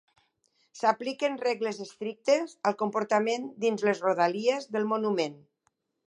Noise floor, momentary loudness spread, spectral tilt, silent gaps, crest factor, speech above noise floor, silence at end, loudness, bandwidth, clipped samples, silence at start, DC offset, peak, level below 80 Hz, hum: -76 dBFS; 6 LU; -4.5 dB/octave; none; 20 dB; 48 dB; 0.7 s; -28 LUFS; 11 kHz; under 0.1%; 0.75 s; under 0.1%; -10 dBFS; -84 dBFS; none